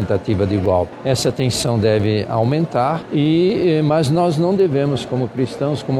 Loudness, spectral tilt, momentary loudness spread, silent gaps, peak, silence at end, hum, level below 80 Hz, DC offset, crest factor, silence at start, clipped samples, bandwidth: -17 LUFS; -6.5 dB/octave; 5 LU; none; -4 dBFS; 0 s; none; -46 dBFS; under 0.1%; 12 dB; 0 s; under 0.1%; 14.5 kHz